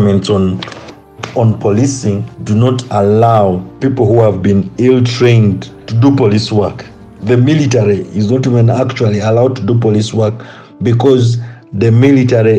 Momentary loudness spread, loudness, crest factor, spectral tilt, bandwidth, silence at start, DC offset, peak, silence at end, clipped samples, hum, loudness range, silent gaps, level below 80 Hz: 10 LU; -11 LUFS; 10 dB; -7.5 dB/octave; 9 kHz; 0 s; under 0.1%; 0 dBFS; 0 s; under 0.1%; none; 2 LU; none; -46 dBFS